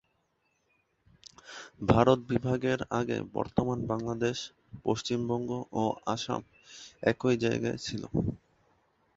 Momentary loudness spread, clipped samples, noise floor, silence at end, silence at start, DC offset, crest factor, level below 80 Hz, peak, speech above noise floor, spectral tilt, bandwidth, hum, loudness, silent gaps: 19 LU; under 0.1%; -75 dBFS; 0.8 s; 1.45 s; under 0.1%; 24 dB; -54 dBFS; -8 dBFS; 45 dB; -6 dB/octave; 8 kHz; none; -31 LUFS; none